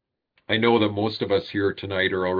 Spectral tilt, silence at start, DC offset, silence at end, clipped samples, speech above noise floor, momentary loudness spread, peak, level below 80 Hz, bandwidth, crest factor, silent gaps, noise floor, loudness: -8 dB/octave; 0.5 s; under 0.1%; 0 s; under 0.1%; 26 dB; 6 LU; -6 dBFS; -62 dBFS; 5.2 kHz; 18 dB; none; -48 dBFS; -23 LUFS